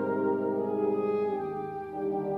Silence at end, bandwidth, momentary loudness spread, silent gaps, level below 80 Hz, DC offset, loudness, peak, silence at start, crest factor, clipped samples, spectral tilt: 0 s; 4.4 kHz; 6 LU; none; -68 dBFS; under 0.1%; -30 LUFS; -18 dBFS; 0 s; 12 dB; under 0.1%; -10 dB/octave